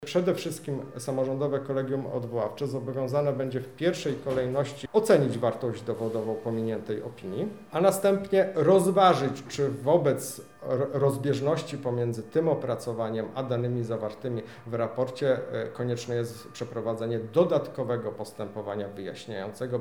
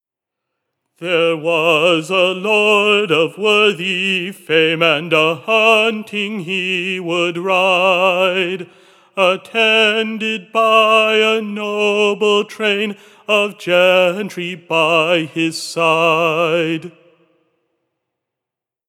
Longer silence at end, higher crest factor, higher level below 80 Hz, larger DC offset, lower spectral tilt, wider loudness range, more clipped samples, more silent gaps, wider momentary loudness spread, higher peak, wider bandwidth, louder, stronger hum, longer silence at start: second, 0 s vs 2 s; about the same, 20 dB vs 16 dB; first, -66 dBFS vs under -90 dBFS; first, 0.1% vs under 0.1%; first, -6.5 dB/octave vs -4 dB/octave; first, 6 LU vs 3 LU; neither; neither; first, 12 LU vs 9 LU; second, -8 dBFS vs 0 dBFS; first, 19.5 kHz vs 16.5 kHz; second, -28 LUFS vs -14 LUFS; neither; second, 0 s vs 1 s